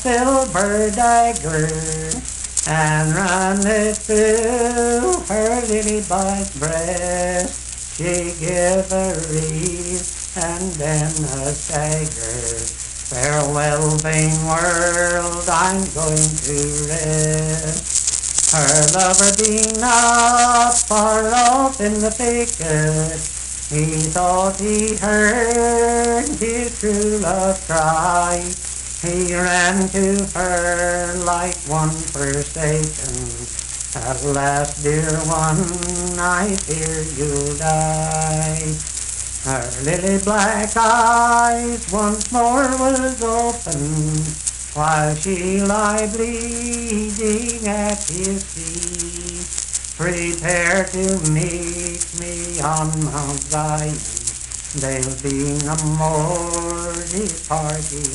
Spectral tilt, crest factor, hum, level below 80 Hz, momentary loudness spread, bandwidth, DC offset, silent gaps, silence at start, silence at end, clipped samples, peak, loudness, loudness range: -3.5 dB/octave; 18 dB; none; -34 dBFS; 9 LU; 11.5 kHz; under 0.1%; none; 0 s; 0 s; under 0.1%; 0 dBFS; -18 LUFS; 6 LU